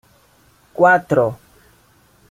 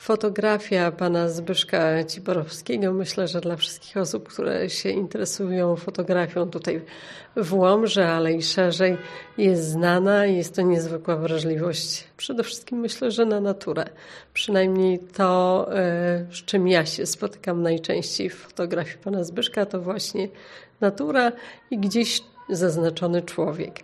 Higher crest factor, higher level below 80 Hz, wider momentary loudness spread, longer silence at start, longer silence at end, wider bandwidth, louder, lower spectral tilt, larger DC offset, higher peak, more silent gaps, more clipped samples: about the same, 18 dB vs 20 dB; first, -56 dBFS vs -66 dBFS; first, 22 LU vs 9 LU; first, 0.8 s vs 0 s; first, 0.95 s vs 0 s; first, 15.5 kHz vs 13 kHz; first, -16 LUFS vs -24 LUFS; first, -7.5 dB/octave vs -5 dB/octave; neither; about the same, -2 dBFS vs -4 dBFS; neither; neither